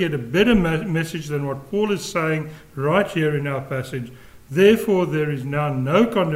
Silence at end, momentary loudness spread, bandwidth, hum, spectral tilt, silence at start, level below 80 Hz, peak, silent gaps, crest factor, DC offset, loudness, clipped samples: 0 s; 11 LU; 16 kHz; none; -6.5 dB/octave; 0 s; -44 dBFS; -2 dBFS; none; 18 dB; under 0.1%; -21 LUFS; under 0.1%